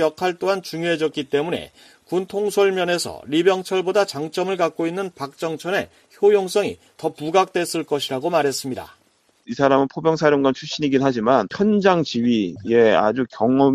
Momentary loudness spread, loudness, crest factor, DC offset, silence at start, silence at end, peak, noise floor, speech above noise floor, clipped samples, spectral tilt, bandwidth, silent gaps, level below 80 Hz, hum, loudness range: 10 LU; -20 LUFS; 18 dB; under 0.1%; 0 s; 0 s; -2 dBFS; -61 dBFS; 41 dB; under 0.1%; -5 dB/octave; 14.5 kHz; none; -60 dBFS; none; 4 LU